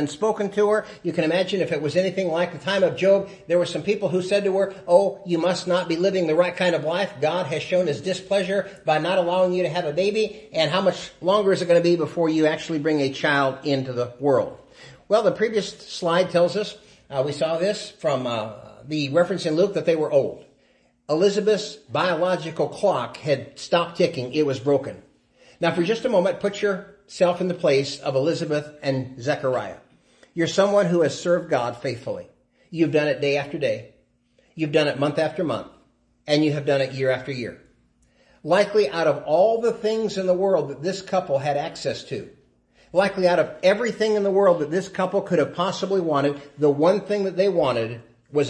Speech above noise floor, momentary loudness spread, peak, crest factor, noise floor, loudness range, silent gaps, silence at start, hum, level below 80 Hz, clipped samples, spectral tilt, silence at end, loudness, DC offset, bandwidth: 41 dB; 8 LU; -4 dBFS; 18 dB; -62 dBFS; 3 LU; none; 0 s; none; -64 dBFS; under 0.1%; -5.5 dB/octave; 0 s; -22 LUFS; under 0.1%; 10.5 kHz